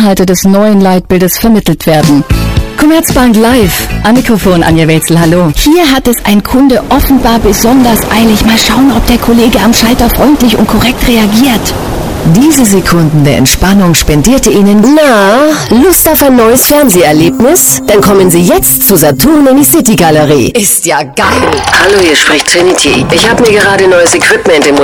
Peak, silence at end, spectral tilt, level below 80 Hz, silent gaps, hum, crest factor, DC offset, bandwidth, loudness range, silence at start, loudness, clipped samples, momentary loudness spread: 0 dBFS; 0 s; -4 dB/octave; -20 dBFS; none; none; 6 dB; under 0.1%; 20 kHz; 2 LU; 0 s; -5 LUFS; 0.4%; 4 LU